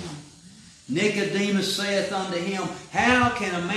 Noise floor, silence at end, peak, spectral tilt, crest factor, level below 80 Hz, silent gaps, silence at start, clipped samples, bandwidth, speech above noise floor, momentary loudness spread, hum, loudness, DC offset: -49 dBFS; 0 s; -6 dBFS; -4 dB/octave; 20 dB; -56 dBFS; none; 0 s; under 0.1%; 14.5 kHz; 25 dB; 11 LU; none; -24 LUFS; under 0.1%